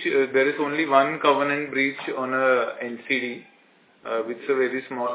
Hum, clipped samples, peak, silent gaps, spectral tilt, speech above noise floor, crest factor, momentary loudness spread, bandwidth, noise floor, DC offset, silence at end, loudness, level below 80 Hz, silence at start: none; under 0.1%; -4 dBFS; none; -8 dB/octave; 34 dB; 20 dB; 10 LU; 4 kHz; -58 dBFS; under 0.1%; 0 s; -23 LUFS; -84 dBFS; 0 s